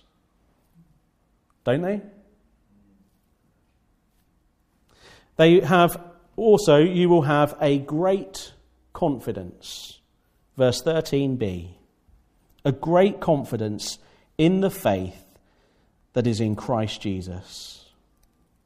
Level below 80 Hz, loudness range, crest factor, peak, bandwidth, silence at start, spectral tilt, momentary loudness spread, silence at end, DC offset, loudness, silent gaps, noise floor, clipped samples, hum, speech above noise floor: -54 dBFS; 13 LU; 20 dB; -4 dBFS; 15.5 kHz; 1.65 s; -6.5 dB/octave; 20 LU; 0.9 s; under 0.1%; -22 LUFS; none; -66 dBFS; under 0.1%; none; 45 dB